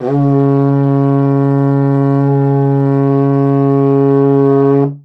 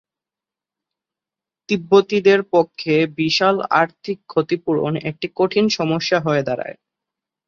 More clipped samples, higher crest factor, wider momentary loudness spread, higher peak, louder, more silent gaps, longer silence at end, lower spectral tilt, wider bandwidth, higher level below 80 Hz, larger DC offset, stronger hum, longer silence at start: neither; second, 10 dB vs 18 dB; second, 2 LU vs 9 LU; about the same, 0 dBFS vs -2 dBFS; first, -11 LUFS vs -18 LUFS; neither; second, 0.05 s vs 0.75 s; first, -12 dB/octave vs -5.5 dB/octave; second, 3.2 kHz vs 7.4 kHz; second, -70 dBFS vs -62 dBFS; neither; neither; second, 0 s vs 1.7 s